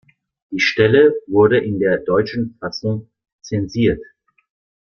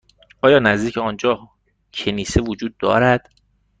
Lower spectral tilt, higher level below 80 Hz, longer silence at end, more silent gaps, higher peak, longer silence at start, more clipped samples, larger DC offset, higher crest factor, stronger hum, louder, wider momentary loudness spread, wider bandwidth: about the same, -6.5 dB/octave vs -5.5 dB/octave; second, -48 dBFS vs -40 dBFS; first, 0.75 s vs 0.6 s; first, 3.32-3.39 s vs none; about the same, -2 dBFS vs -2 dBFS; about the same, 0.5 s vs 0.45 s; neither; neither; about the same, 16 dB vs 18 dB; neither; about the same, -17 LUFS vs -18 LUFS; about the same, 12 LU vs 11 LU; second, 6.6 kHz vs 9.4 kHz